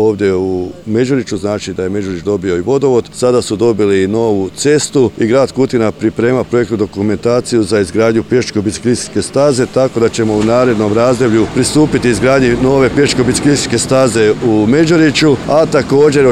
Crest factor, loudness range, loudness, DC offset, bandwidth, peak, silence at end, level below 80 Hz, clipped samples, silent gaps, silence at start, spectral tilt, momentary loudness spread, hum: 12 dB; 3 LU; -12 LUFS; under 0.1%; 14 kHz; 0 dBFS; 0 s; -38 dBFS; under 0.1%; none; 0 s; -5.5 dB/octave; 6 LU; none